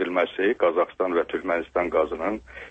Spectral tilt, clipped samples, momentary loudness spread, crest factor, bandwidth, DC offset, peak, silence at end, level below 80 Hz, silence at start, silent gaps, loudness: -6.5 dB/octave; under 0.1%; 6 LU; 16 dB; 8 kHz; under 0.1%; -8 dBFS; 0 s; -54 dBFS; 0 s; none; -24 LUFS